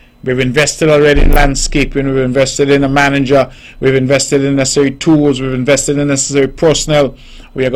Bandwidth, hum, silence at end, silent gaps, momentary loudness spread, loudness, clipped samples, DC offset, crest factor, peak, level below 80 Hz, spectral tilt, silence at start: 17 kHz; none; 0 s; none; 5 LU; -11 LUFS; under 0.1%; under 0.1%; 10 dB; 0 dBFS; -20 dBFS; -4.5 dB/octave; 0.25 s